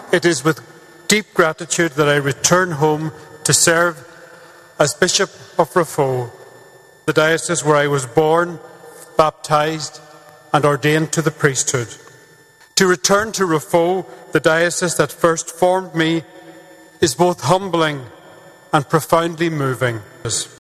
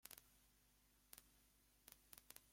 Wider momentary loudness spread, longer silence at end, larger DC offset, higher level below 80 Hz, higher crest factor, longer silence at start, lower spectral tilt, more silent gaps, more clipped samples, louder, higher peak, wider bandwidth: first, 9 LU vs 5 LU; first, 0.15 s vs 0 s; neither; first, -54 dBFS vs -82 dBFS; second, 18 dB vs 38 dB; about the same, 0 s vs 0 s; first, -3.5 dB/octave vs -1 dB/octave; neither; neither; first, -17 LUFS vs -64 LUFS; first, 0 dBFS vs -30 dBFS; second, 14 kHz vs 16.5 kHz